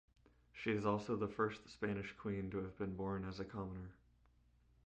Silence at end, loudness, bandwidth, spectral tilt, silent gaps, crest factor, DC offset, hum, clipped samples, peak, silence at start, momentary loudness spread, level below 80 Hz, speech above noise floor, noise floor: 0.9 s; -43 LUFS; 8.8 kHz; -7.5 dB/octave; none; 20 dB; under 0.1%; none; under 0.1%; -22 dBFS; 0.55 s; 9 LU; -64 dBFS; 30 dB; -72 dBFS